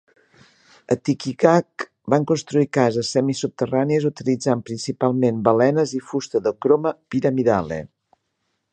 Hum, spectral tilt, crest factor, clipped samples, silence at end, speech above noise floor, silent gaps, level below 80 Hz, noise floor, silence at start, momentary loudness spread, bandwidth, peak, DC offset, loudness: none; -6 dB/octave; 20 dB; under 0.1%; 0.85 s; 54 dB; none; -58 dBFS; -74 dBFS; 0.9 s; 7 LU; 9.2 kHz; 0 dBFS; under 0.1%; -21 LUFS